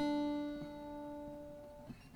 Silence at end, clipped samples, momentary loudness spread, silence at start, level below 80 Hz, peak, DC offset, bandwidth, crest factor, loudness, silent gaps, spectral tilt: 0 s; under 0.1%; 15 LU; 0 s; -64 dBFS; -28 dBFS; under 0.1%; 12.5 kHz; 16 dB; -44 LUFS; none; -6.5 dB/octave